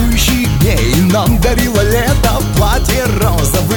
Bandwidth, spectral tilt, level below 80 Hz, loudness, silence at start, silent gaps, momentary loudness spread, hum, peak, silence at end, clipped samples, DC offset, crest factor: 19.5 kHz; -5 dB/octave; -16 dBFS; -12 LUFS; 0 s; none; 2 LU; none; 0 dBFS; 0 s; under 0.1%; under 0.1%; 10 dB